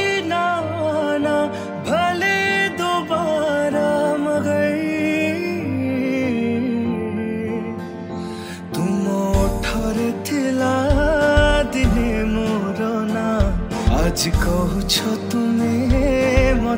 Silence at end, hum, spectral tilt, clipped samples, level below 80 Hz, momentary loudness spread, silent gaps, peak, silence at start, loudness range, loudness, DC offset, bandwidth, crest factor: 0 s; none; -5.5 dB/octave; under 0.1%; -28 dBFS; 7 LU; none; -2 dBFS; 0 s; 4 LU; -20 LUFS; under 0.1%; 16 kHz; 16 dB